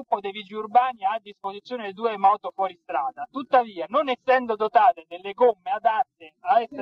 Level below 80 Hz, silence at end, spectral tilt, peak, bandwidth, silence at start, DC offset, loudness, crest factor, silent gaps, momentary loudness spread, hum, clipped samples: -76 dBFS; 0 s; -6 dB/octave; -6 dBFS; 5.8 kHz; 0 s; under 0.1%; -24 LUFS; 18 dB; none; 13 LU; none; under 0.1%